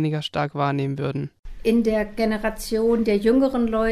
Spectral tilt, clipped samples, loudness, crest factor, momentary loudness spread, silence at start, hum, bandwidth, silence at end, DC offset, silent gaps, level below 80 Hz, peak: -6.5 dB/octave; under 0.1%; -22 LUFS; 14 dB; 8 LU; 0 s; none; 15.5 kHz; 0 s; under 0.1%; 1.39-1.43 s; -40 dBFS; -8 dBFS